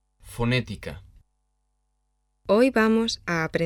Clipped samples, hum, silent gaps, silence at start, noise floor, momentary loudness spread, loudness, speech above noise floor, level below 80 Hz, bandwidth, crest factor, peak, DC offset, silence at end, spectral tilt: under 0.1%; 50 Hz at -65 dBFS; none; 0.25 s; -73 dBFS; 20 LU; -23 LUFS; 50 dB; -48 dBFS; 14.5 kHz; 18 dB; -8 dBFS; under 0.1%; 0 s; -5.5 dB/octave